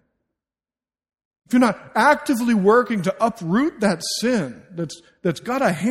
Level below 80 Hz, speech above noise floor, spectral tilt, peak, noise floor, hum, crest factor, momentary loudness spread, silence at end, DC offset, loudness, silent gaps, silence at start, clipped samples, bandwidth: -60 dBFS; over 70 dB; -5 dB/octave; -2 dBFS; under -90 dBFS; none; 18 dB; 13 LU; 0 s; under 0.1%; -20 LUFS; none; 1.5 s; under 0.1%; 16 kHz